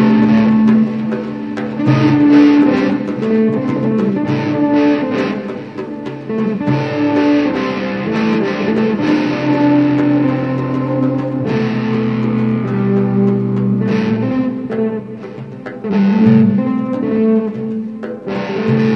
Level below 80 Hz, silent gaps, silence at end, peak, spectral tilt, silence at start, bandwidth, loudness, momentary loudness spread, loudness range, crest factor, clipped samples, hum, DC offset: -52 dBFS; none; 0 s; 0 dBFS; -8.5 dB/octave; 0 s; 6.4 kHz; -15 LUFS; 11 LU; 4 LU; 14 dB; under 0.1%; none; 0.1%